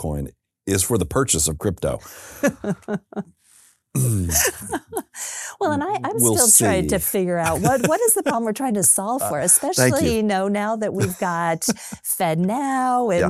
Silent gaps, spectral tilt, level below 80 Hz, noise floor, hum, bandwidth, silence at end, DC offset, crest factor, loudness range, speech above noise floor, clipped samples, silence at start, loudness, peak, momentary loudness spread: none; -4 dB/octave; -42 dBFS; -55 dBFS; none; 16 kHz; 0 s; under 0.1%; 20 dB; 7 LU; 34 dB; under 0.1%; 0 s; -19 LUFS; -2 dBFS; 13 LU